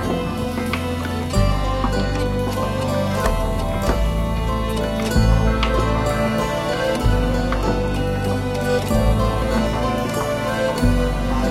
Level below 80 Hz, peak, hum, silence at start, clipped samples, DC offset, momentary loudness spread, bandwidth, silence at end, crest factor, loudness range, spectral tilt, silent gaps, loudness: -24 dBFS; -4 dBFS; none; 0 s; under 0.1%; under 0.1%; 4 LU; 15.5 kHz; 0 s; 16 dB; 2 LU; -6 dB/octave; none; -21 LUFS